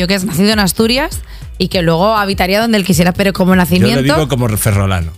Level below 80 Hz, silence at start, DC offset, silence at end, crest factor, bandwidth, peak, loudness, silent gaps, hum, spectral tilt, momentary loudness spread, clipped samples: -30 dBFS; 0 s; under 0.1%; 0 s; 12 dB; 16.5 kHz; 0 dBFS; -12 LUFS; none; none; -5 dB/octave; 5 LU; 0.1%